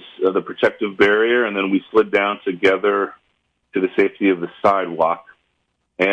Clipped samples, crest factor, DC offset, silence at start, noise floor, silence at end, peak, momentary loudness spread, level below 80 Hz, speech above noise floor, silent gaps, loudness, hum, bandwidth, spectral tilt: under 0.1%; 16 dB; under 0.1%; 0 s; -70 dBFS; 0 s; -2 dBFS; 6 LU; -60 dBFS; 53 dB; none; -18 LUFS; none; 8.4 kHz; -6 dB/octave